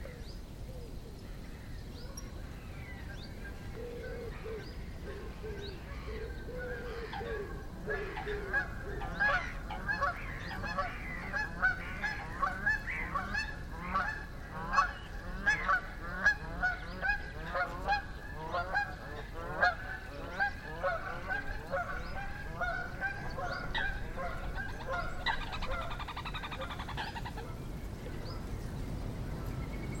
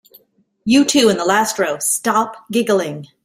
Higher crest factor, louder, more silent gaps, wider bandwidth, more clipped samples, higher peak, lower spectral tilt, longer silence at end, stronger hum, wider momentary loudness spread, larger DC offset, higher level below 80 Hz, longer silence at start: first, 22 dB vs 16 dB; second, -37 LUFS vs -16 LUFS; neither; about the same, 16.5 kHz vs 16 kHz; neither; second, -14 dBFS vs -2 dBFS; first, -5 dB/octave vs -3 dB/octave; second, 0 s vs 0.2 s; neither; first, 14 LU vs 7 LU; neither; first, -44 dBFS vs -58 dBFS; second, 0 s vs 0.65 s